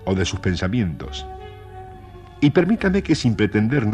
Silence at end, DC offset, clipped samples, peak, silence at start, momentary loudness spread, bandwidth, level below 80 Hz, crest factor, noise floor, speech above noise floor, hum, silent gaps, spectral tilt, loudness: 0 s; under 0.1%; under 0.1%; -4 dBFS; 0 s; 21 LU; 10 kHz; -40 dBFS; 18 dB; -40 dBFS; 21 dB; none; none; -6.5 dB/octave; -20 LUFS